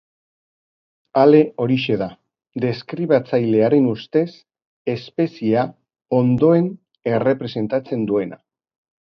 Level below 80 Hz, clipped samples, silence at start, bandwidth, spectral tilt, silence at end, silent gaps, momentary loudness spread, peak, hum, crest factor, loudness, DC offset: -60 dBFS; under 0.1%; 1.15 s; 6.2 kHz; -9.5 dB/octave; 0.75 s; 4.66-4.85 s; 12 LU; 0 dBFS; none; 18 dB; -19 LUFS; under 0.1%